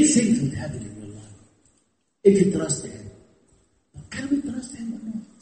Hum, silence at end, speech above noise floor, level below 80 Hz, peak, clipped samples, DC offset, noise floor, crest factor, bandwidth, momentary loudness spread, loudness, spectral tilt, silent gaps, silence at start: none; 0.15 s; 46 dB; -54 dBFS; -4 dBFS; under 0.1%; under 0.1%; -68 dBFS; 22 dB; 8.8 kHz; 23 LU; -23 LUFS; -5 dB/octave; none; 0 s